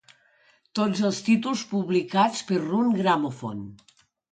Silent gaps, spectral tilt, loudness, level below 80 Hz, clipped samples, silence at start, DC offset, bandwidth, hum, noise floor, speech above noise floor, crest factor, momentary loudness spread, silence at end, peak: none; -5.5 dB/octave; -25 LUFS; -68 dBFS; under 0.1%; 0.75 s; under 0.1%; 9.2 kHz; none; -62 dBFS; 38 dB; 18 dB; 12 LU; 0.55 s; -8 dBFS